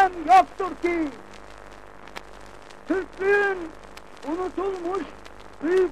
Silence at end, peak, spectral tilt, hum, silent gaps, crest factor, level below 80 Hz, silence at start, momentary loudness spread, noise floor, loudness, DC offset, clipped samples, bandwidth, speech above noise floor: 0 s; -4 dBFS; -4.5 dB/octave; none; none; 20 dB; -52 dBFS; 0 s; 27 LU; -45 dBFS; -24 LUFS; 0.5%; under 0.1%; 13.5 kHz; 22 dB